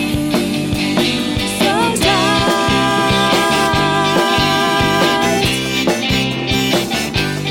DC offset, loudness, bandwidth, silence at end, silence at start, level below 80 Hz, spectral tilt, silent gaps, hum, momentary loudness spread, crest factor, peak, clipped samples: under 0.1%; -14 LUFS; 17.5 kHz; 0 s; 0 s; -34 dBFS; -4 dB/octave; none; none; 4 LU; 12 dB; -2 dBFS; under 0.1%